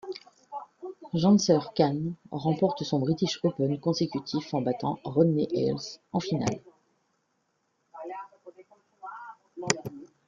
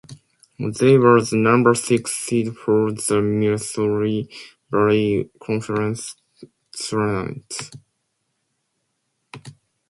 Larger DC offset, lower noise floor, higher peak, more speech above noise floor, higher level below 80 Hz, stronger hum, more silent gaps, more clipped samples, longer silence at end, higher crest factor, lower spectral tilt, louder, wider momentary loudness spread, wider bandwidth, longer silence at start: neither; about the same, -75 dBFS vs -73 dBFS; about the same, -2 dBFS vs 0 dBFS; second, 48 dB vs 54 dB; second, -66 dBFS vs -56 dBFS; neither; neither; neither; second, 0.2 s vs 0.35 s; first, 26 dB vs 20 dB; about the same, -6 dB/octave vs -5.5 dB/octave; second, -28 LUFS vs -20 LUFS; first, 19 LU vs 16 LU; second, 9.4 kHz vs 12 kHz; about the same, 0.05 s vs 0.1 s